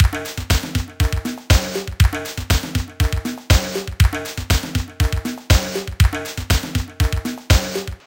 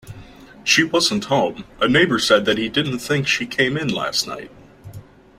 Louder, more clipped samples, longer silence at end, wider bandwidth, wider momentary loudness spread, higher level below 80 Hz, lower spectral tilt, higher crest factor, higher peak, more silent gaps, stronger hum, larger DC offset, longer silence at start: about the same, -20 LUFS vs -18 LUFS; neither; second, 0.1 s vs 0.35 s; about the same, 17 kHz vs 16 kHz; about the same, 8 LU vs 7 LU; first, -22 dBFS vs -50 dBFS; about the same, -4.5 dB/octave vs -3.5 dB/octave; about the same, 18 dB vs 18 dB; about the same, 0 dBFS vs -2 dBFS; neither; neither; neither; about the same, 0 s vs 0.05 s